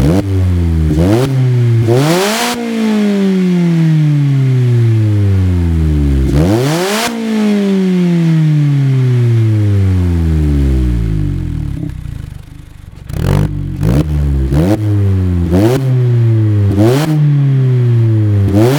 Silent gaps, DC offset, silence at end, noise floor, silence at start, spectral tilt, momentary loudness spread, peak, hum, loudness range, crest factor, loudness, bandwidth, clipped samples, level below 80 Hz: none; under 0.1%; 0 s; -31 dBFS; 0 s; -7 dB/octave; 5 LU; 0 dBFS; none; 5 LU; 10 dB; -12 LUFS; 18 kHz; under 0.1%; -22 dBFS